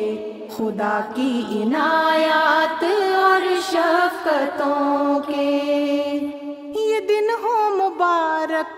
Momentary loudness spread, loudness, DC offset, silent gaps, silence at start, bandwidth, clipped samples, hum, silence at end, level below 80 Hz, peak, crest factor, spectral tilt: 9 LU; -20 LUFS; under 0.1%; none; 0 s; 16 kHz; under 0.1%; none; 0 s; -68 dBFS; -4 dBFS; 16 dB; -4 dB/octave